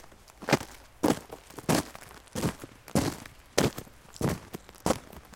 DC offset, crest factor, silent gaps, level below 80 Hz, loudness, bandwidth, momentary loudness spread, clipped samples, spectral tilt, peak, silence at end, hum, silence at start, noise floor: under 0.1%; 28 dB; none; -50 dBFS; -31 LUFS; 17 kHz; 17 LU; under 0.1%; -4.5 dB/octave; -4 dBFS; 0.15 s; none; 0.05 s; -48 dBFS